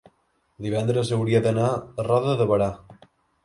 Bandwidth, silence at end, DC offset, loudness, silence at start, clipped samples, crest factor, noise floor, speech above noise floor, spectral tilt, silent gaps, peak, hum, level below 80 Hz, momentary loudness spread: 11.5 kHz; 0.5 s; under 0.1%; -23 LUFS; 0.6 s; under 0.1%; 16 dB; -67 dBFS; 45 dB; -7 dB/octave; none; -8 dBFS; none; -54 dBFS; 7 LU